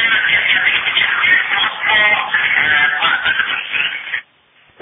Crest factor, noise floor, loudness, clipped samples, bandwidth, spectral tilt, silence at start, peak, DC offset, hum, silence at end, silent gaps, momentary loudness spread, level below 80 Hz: 14 dB; -52 dBFS; -13 LUFS; under 0.1%; 3.9 kHz; -6.5 dB/octave; 0 s; 0 dBFS; under 0.1%; none; 0.6 s; none; 6 LU; -54 dBFS